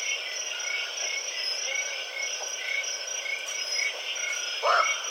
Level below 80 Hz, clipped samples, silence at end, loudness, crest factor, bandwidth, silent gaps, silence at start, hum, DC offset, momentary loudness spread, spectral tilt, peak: under -90 dBFS; under 0.1%; 0 s; -28 LUFS; 20 dB; 17 kHz; none; 0 s; none; under 0.1%; 6 LU; 5.5 dB/octave; -10 dBFS